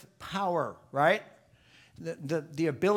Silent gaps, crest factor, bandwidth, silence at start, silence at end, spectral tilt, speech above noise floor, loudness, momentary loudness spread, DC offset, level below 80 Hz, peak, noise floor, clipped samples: none; 20 dB; 16.5 kHz; 0.2 s; 0 s; -6 dB/octave; 31 dB; -31 LUFS; 13 LU; under 0.1%; -68 dBFS; -10 dBFS; -60 dBFS; under 0.1%